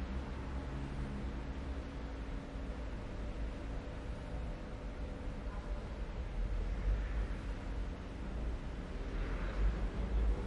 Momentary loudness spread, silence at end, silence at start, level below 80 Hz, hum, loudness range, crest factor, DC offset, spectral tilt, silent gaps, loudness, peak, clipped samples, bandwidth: 7 LU; 0 s; 0 s; -40 dBFS; none; 3 LU; 16 dB; under 0.1%; -7 dB/octave; none; -43 LUFS; -24 dBFS; under 0.1%; 8.4 kHz